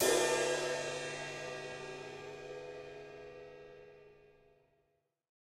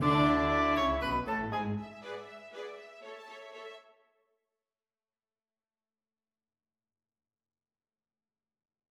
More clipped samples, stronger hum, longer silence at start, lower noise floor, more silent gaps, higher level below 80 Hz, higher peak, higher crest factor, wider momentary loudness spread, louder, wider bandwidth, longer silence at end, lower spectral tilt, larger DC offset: neither; neither; about the same, 0 s vs 0 s; second, -80 dBFS vs under -90 dBFS; neither; second, -70 dBFS vs -52 dBFS; second, -18 dBFS vs -14 dBFS; about the same, 22 dB vs 22 dB; about the same, 22 LU vs 21 LU; second, -38 LUFS vs -30 LUFS; first, 16 kHz vs 12.5 kHz; second, 1.2 s vs 5.1 s; second, -2 dB/octave vs -6.5 dB/octave; neither